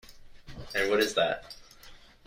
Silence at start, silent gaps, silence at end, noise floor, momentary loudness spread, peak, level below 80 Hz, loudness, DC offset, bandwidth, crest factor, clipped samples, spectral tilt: 0.05 s; none; 0.3 s; -52 dBFS; 22 LU; -12 dBFS; -54 dBFS; -28 LUFS; under 0.1%; 16 kHz; 20 dB; under 0.1%; -3 dB/octave